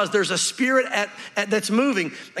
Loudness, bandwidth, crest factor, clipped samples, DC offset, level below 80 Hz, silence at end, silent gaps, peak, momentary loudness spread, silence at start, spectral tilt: -22 LUFS; 15 kHz; 14 dB; under 0.1%; under 0.1%; -82 dBFS; 0 s; none; -8 dBFS; 7 LU; 0 s; -3 dB/octave